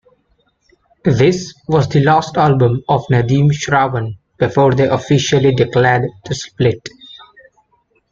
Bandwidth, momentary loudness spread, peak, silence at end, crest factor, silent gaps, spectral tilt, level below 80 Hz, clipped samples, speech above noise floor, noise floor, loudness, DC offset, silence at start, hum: 7.6 kHz; 10 LU; -2 dBFS; 0.95 s; 14 dB; none; -6.5 dB/octave; -46 dBFS; under 0.1%; 47 dB; -60 dBFS; -14 LUFS; under 0.1%; 1.05 s; none